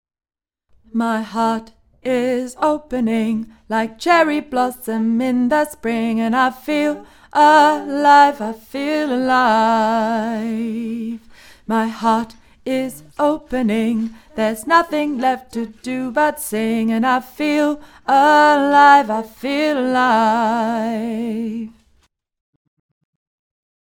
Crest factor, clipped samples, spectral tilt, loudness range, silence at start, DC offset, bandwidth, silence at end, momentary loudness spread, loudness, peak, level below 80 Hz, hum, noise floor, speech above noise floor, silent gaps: 18 dB; under 0.1%; -4.5 dB/octave; 7 LU; 0.95 s; under 0.1%; 18 kHz; 2.15 s; 14 LU; -17 LUFS; 0 dBFS; -54 dBFS; none; -77 dBFS; 61 dB; none